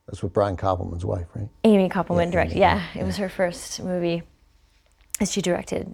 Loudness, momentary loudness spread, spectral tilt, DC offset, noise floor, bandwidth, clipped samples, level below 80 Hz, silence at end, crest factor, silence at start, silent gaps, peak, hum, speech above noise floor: -24 LUFS; 10 LU; -5.5 dB/octave; under 0.1%; -59 dBFS; over 20 kHz; under 0.1%; -44 dBFS; 0 s; 22 dB; 0.1 s; none; -2 dBFS; none; 36 dB